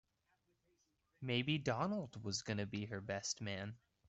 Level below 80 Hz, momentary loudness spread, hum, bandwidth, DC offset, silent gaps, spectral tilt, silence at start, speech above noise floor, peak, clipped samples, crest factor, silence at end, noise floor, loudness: -74 dBFS; 8 LU; none; 8.2 kHz; under 0.1%; none; -4.5 dB/octave; 1.2 s; 40 dB; -24 dBFS; under 0.1%; 20 dB; 0.3 s; -81 dBFS; -42 LUFS